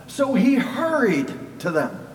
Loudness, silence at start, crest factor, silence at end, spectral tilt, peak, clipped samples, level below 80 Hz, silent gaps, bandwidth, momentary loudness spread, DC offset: -21 LUFS; 0 s; 14 dB; 0 s; -6 dB/octave; -8 dBFS; under 0.1%; -60 dBFS; none; 17 kHz; 8 LU; under 0.1%